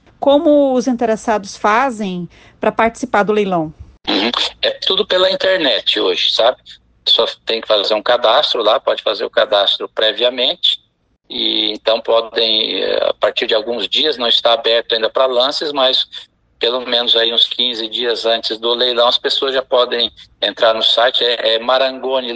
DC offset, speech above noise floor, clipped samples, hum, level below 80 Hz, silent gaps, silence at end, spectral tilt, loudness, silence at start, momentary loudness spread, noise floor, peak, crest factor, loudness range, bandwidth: under 0.1%; 44 dB; under 0.1%; none; -54 dBFS; none; 0 s; -3.5 dB/octave; -14 LUFS; 0.2 s; 7 LU; -59 dBFS; 0 dBFS; 16 dB; 2 LU; 9.2 kHz